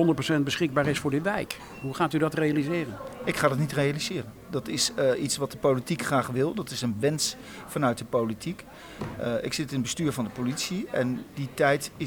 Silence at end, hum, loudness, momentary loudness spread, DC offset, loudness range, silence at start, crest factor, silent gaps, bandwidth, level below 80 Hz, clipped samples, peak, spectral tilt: 0 s; none; -28 LUFS; 11 LU; under 0.1%; 3 LU; 0 s; 20 dB; none; over 20 kHz; -56 dBFS; under 0.1%; -8 dBFS; -4.5 dB/octave